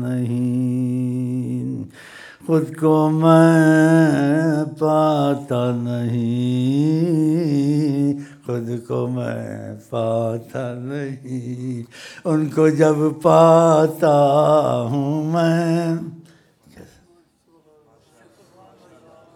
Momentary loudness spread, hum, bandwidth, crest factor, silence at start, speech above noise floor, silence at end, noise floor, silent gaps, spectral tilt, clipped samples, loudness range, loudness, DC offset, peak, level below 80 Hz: 15 LU; none; 14.5 kHz; 18 dB; 0 s; 40 dB; 2.55 s; -57 dBFS; none; -7.5 dB/octave; under 0.1%; 10 LU; -18 LUFS; under 0.1%; 0 dBFS; -66 dBFS